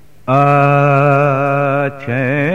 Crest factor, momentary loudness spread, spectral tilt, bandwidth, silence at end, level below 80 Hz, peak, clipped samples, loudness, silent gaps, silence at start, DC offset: 12 dB; 7 LU; -9 dB/octave; 6.8 kHz; 0 s; -54 dBFS; 0 dBFS; under 0.1%; -13 LUFS; none; 0.25 s; 1%